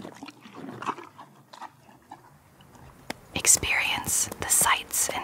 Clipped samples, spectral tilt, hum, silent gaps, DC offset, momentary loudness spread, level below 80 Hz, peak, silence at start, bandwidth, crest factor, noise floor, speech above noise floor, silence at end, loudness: under 0.1%; -0.5 dB/octave; none; none; under 0.1%; 25 LU; -54 dBFS; -4 dBFS; 0 s; 16 kHz; 26 dB; -54 dBFS; 30 dB; 0 s; -23 LUFS